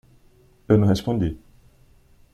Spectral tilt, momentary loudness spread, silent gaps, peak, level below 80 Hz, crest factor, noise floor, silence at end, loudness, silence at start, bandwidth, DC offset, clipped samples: -8 dB/octave; 11 LU; none; -4 dBFS; -44 dBFS; 20 dB; -55 dBFS; 0.95 s; -21 LUFS; 0.7 s; 13.5 kHz; under 0.1%; under 0.1%